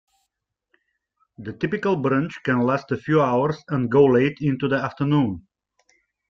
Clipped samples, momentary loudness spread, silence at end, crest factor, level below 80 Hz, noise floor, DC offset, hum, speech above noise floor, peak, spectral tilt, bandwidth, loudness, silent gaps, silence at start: under 0.1%; 9 LU; 0.9 s; 18 dB; -58 dBFS; -79 dBFS; under 0.1%; none; 58 dB; -4 dBFS; -8.5 dB/octave; 7 kHz; -21 LUFS; none; 1.4 s